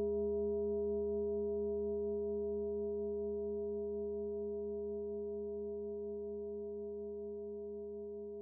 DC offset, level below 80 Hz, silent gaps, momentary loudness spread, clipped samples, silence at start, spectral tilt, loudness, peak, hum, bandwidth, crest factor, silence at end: under 0.1%; -60 dBFS; none; 8 LU; under 0.1%; 0 s; -4 dB/octave; -40 LUFS; -28 dBFS; none; 1.4 kHz; 10 dB; 0 s